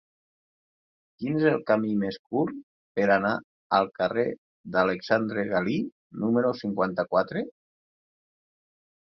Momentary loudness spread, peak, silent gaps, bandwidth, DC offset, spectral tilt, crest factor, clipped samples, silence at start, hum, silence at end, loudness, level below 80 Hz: 10 LU; -8 dBFS; 2.19-2.25 s, 2.63-2.95 s, 3.44-3.70 s, 4.38-4.64 s, 5.92-6.10 s; 6.4 kHz; under 0.1%; -8 dB/octave; 20 dB; under 0.1%; 1.2 s; none; 1.55 s; -27 LUFS; -66 dBFS